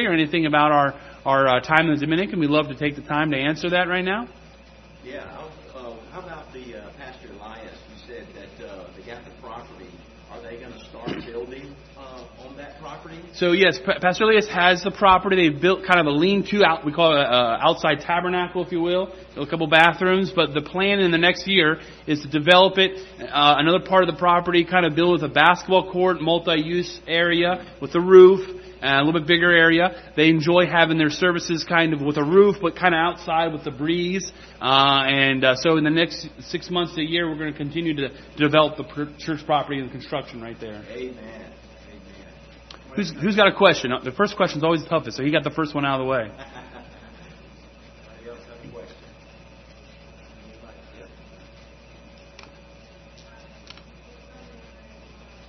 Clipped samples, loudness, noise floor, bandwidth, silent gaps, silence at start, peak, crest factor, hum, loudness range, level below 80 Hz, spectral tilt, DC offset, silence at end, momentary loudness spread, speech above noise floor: under 0.1%; -19 LUFS; -47 dBFS; 6.4 kHz; none; 0 s; 0 dBFS; 22 dB; none; 20 LU; -50 dBFS; -5.5 dB/octave; under 0.1%; 4.4 s; 23 LU; 27 dB